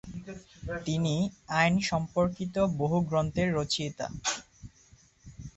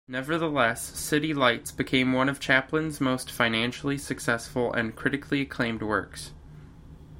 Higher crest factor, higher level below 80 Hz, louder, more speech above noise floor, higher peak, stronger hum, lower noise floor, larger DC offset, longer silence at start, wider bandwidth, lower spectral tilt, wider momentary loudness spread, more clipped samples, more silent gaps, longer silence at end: about the same, 20 dB vs 22 dB; about the same, -52 dBFS vs -52 dBFS; second, -29 LUFS vs -26 LUFS; first, 31 dB vs 20 dB; second, -10 dBFS vs -6 dBFS; neither; first, -60 dBFS vs -47 dBFS; neither; about the same, 0.05 s vs 0.1 s; second, 8.4 kHz vs 16.5 kHz; about the same, -5 dB/octave vs -4.5 dB/octave; first, 15 LU vs 7 LU; neither; neither; about the same, 0.05 s vs 0 s